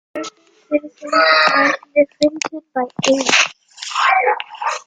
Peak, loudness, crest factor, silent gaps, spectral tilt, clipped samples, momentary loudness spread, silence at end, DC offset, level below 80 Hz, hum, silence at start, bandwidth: 0 dBFS; -16 LUFS; 16 dB; none; -2 dB/octave; under 0.1%; 14 LU; 0.05 s; under 0.1%; -62 dBFS; none; 0.15 s; 9.6 kHz